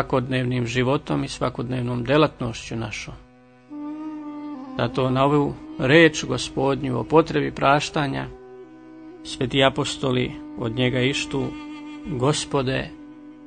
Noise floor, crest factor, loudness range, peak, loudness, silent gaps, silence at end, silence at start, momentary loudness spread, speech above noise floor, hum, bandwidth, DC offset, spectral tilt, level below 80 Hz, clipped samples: -46 dBFS; 22 dB; 6 LU; -2 dBFS; -22 LUFS; none; 0 s; 0 s; 17 LU; 24 dB; none; 9.6 kHz; under 0.1%; -5.5 dB/octave; -48 dBFS; under 0.1%